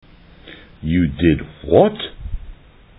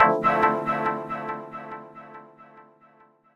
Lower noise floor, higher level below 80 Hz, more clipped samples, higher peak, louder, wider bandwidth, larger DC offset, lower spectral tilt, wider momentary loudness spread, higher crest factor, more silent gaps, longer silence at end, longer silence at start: second, -42 dBFS vs -58 dBFS; first, -34 dBFS vs -60 dBFS; neither; about the same, 0 dBFS vs 0 dBFS; first, -18 LUFS vs -24 LUFS; second, 4 kHz vs 12.5 kHz; neither; first, -10 dB/octave vs -7 dB/octave; second, 19 LU vs 23 LU; second, 20 dB vs 26 dB; neither; second, 0.45 s vs 0.75 s; first, 0.45 s vs 0 s